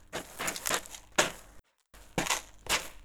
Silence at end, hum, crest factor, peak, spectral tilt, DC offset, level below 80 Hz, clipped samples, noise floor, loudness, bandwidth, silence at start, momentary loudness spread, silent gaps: 0 s; none; 28 dB; -8 dBFS; -1.5 dB/octave; under 0.1%; -56 dBFS; under 0.1%; -57 dBFS; -32 LUFS; over 20 kHz; 0.1 s; 8 LU; none